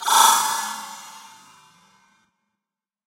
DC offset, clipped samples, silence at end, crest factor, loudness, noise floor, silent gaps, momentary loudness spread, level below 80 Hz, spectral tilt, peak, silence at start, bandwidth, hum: under 0.1%; under 0.1%; 1.85 s; 24 dB; -18 LUFS; -88 dBFS; none; 24 LU; -82 dBFS; 2.5 dB/octave; 0 dBFS; 0 s; 16 kHz; none